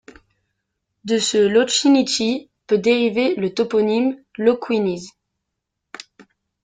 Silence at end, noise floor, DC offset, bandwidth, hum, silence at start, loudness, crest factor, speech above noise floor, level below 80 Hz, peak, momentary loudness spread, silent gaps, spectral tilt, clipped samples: 0.4 s; -79 dBFS; under 0.1%; 9.6 kHz; none; 1.05 s; -18 LUFS; 16 dB; 61 dB; -62 dBFS; -4 dBFS; 18 LU; none; -4 dB/octave; under 0.1%